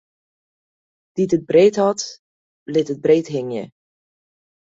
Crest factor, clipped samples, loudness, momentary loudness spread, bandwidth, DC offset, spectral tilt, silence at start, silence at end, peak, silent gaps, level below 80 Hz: 18 dB; under 0.1%; -18 LUFS; 16 LU; 8 kHz; under 0.1%; -5.5 dB/octave; 1.15 s; 1 s; -4 dBFS; 2.19-2.66 s; -64 dBFS